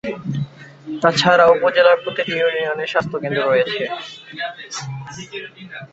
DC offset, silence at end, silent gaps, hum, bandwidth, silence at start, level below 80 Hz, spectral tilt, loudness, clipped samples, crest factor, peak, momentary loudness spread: under 0.1%; 0.05 s; none; none; 8 kHz; 0.05 s; -58 dBFS; -4.5 dB/octave; -18 LUFS; under 0.1%; 18 dB; -2 dBFS; 19 LU